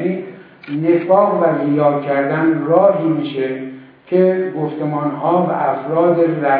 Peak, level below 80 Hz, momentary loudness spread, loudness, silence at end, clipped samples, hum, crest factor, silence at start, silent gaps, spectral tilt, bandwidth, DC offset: 0 dBFS; -68 dBFS; 9 LU; -16 LUFS; 0 s; under 0.1%; none; 16 dB; 0 s; none; -11.5 dB/octave; 4.7 kHz; under 0.1%